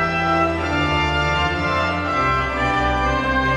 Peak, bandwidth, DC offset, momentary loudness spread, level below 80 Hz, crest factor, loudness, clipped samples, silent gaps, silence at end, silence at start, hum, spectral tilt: -8 dBFS; 11.5 kHz; under 0.1%; 1 LU; -30 dBFS; 12 dB; -19 LUFS; under 0.1%; none; 0 s; 0 s; none; -5.5 dB/octave